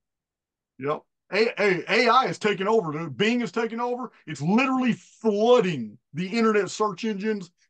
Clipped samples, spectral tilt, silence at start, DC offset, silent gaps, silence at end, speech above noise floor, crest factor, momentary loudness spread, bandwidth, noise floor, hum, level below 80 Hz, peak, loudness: under 0.1%; -5.5 dB/octave; 0.8 s; under 0.1%; none; 0.25 s; 65 dB; 18 dB; 13 LU; 9 kHz; -89 dBFS; none; -74 dBFS; -6 dBFS; -24 LUFS